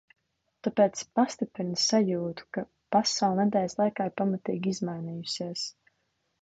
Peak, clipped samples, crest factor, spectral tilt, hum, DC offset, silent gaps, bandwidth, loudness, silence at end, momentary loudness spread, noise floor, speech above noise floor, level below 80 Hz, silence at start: -10 dBFS; under 0.1%; 18 dB; -4.5 dB/octave; none; under 0.1%; none; 9 kHz; -29 LUFS; 0.7 s; 11 LU; -76 dBFS; 48 dB; -70 dBFS; 0.65 s